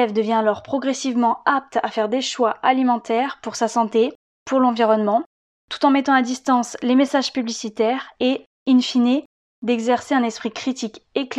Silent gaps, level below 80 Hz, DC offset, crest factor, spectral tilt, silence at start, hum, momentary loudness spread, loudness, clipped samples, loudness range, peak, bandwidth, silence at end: 4.15-4.46 s, 5.26-5.68 s, 8.46-8.66 s, 9.25-9.62 s; -68 dBFS; under 0.1%; 16 dB; -4 dB/octave; 0 s; none; 8 LU; -20 LUFS; under 0.1%; 2 LU; -4 dBFS; 10 kHz; 0 s